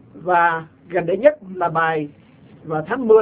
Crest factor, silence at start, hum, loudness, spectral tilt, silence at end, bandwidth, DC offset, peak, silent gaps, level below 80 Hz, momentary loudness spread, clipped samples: 18 dB; 0.15 s; none; -20 LUFS; -10 dB/octave; 0 s; 4 kHz; under 0.1%; -2 dBFS; none; -60 dBFS; 11 LU; under 0.1%